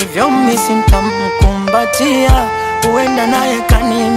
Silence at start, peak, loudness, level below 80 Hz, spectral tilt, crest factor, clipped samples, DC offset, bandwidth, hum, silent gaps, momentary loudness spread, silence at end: 0 s; 0 dBFS; -12 LUFS; -18 dBFS; -5 dB/octave; 12 dB; under 0.1%; under 0.1%; 16.5 kHz; none; none; 3 LU; 0 s